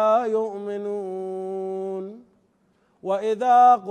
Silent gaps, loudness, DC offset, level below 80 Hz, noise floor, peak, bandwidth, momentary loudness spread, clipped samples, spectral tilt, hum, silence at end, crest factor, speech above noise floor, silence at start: none; -23 LUFS; under 0.1%; -80 dBFS; -64 dBFS; -8 dBFS; 9.2 kHz; 16 LU; under 0.1%; -6 dB/octave; none; 0 s; 16 dB; 44 dB; 0 s